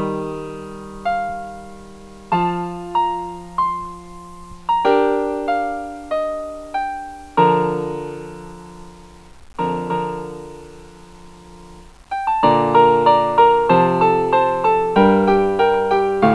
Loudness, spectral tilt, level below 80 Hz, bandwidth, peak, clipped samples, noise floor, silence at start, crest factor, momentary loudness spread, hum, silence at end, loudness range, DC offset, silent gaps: -18 LUFS; -7 dB/octave; -46 dBFS; 11 kHz; 0 dBFS; under 0.1%; -41 dBFS; 0 s; 18 dB; 20 LU; none; 0 s; 13 LU; under 0.1%; none